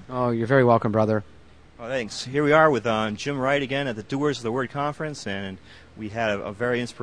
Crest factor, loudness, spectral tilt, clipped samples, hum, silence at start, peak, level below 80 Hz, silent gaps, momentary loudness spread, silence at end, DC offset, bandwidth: 20 dB; -24 LUFS; -6 dB/octave; under 0.1%; none; 0 s; -4 dBFS; -56 dBFS; none; 13 LU; 0 s; 0.2%; 10.5 kHz